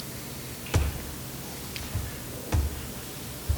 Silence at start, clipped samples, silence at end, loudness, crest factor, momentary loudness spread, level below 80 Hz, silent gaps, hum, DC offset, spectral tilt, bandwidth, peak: 0 s; under 0.1%; 0 s; -33 LUFS; 26 dB; 8 LU; -36 dBFS; none; 60 Hz at -50 dBFS; under 0.1%; -4.5 dB/octave; over 20 kHz; -6 dBFS